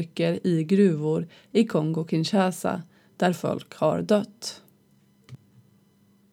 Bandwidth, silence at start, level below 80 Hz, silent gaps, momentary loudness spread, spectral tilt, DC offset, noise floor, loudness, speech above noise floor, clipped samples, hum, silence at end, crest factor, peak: 15.5 kHz; 0 s; -72 dBFS; none; 12 LU; -6.5 dB/octave; under 0.1%; -61 dBFS; -25 LUFS; 37 dB; under 0.1%; none; 1 s; 18 dB; -8 dBFS